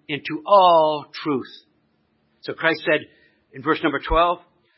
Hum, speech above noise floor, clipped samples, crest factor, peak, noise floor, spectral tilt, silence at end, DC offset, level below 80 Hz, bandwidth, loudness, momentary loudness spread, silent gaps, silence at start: none; 46 dB; under 0.1%; 18 dB; -2 dBFS; -66 dBFS; -9 dB/octave; 0.4 s; under 0.1%; -42 dBFS; 5.8 kHz; -20 LUFS; 15 LU; none; 0.1 s